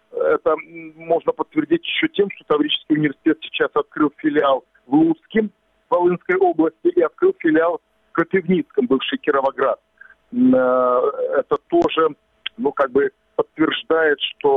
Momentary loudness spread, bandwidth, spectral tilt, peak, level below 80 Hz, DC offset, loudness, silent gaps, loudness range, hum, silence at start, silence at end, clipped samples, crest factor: 7 LU; 4.1 kHz; -8 dB/octave; -4 dBFS; -60 dBFS; under 0.1%; -19 LUFS; none; 1 LU; none; 0.15 s; 0 s; under 0.1%; 16 dB